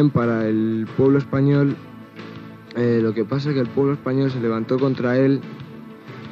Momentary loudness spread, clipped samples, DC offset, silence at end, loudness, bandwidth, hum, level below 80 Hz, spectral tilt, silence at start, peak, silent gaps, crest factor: 19 LU; under 0.1%; under 0.1%; 0 s; -20 LUFS; 6.6 kHz; none; -58 dBFS; -9.5 dB/octave; 0 s; -6 dBFS; none; 14 dB